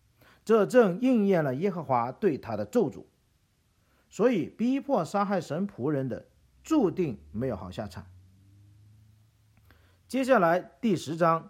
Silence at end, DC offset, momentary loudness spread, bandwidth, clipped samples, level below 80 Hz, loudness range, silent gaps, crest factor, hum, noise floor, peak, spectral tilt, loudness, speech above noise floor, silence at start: 0 s; under 0.1%; 13 LU; 15.5 kHz; under 0.1%; -62 dBFS; 7 LU; none; 20 dB; none; -69 dBFS; -8 dBFS; -7 dB/octave; -27 LUFS; 42 dB; 0.45 s